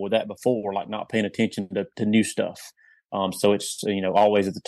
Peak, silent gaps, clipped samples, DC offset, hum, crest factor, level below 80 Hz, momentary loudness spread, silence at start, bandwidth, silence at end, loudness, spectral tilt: -6 dBFS; none; under 0.1%; under 0.1%; none; 18 dB; -68 dBFS; 10 LU; 0 s; 12.5 kHz; 0.1 s; -24 LUFS; -5 dB/octave